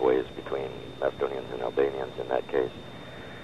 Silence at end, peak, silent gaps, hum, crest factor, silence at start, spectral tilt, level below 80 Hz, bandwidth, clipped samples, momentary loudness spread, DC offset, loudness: 0 s; -12 dBFS; none; none; 18 dB; 0 s; -6.5 dB/octave; -58 dBFS; 11.5 kHz; under 0.1%; 14 LU; 0.3%; -30 LUFS